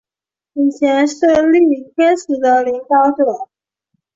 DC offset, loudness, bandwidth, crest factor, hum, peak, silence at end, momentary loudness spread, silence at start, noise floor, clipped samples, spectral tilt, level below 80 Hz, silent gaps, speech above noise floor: under 0.1%; -14 LUFS; 7.8 kHz; 12 dB; none; -2 dBFS; 0.7 s; 7 LU; 0.55 s; -89 dBFS; under 0.1%; -4 dB/octave; -58 dBFS; none; 76 dB